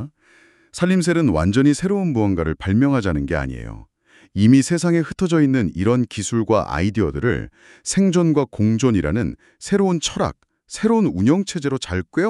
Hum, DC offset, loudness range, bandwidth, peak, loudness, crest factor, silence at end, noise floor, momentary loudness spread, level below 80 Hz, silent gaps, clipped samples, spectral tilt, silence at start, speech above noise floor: none; under 0.1%; 2 LU; 12 kHz; -4 dBFS; -19 LUFS; 16 dB; 0 s; -54 dBFS; 10 LU; -40 dBFS; none; under 0.1%; -6 dB/octave; 0 s; 36 dB